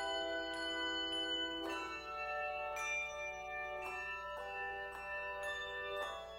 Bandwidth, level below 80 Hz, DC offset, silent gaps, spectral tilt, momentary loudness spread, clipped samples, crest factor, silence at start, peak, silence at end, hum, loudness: 16 kHz; -64 dBFS; under 0.1%; none; -2 dB/octave; 6 LU; under 0.1%; 14 dB; 0 s; -28 dBFS; 0 s; 60 Hz at -65 dBFS; -41 LUFS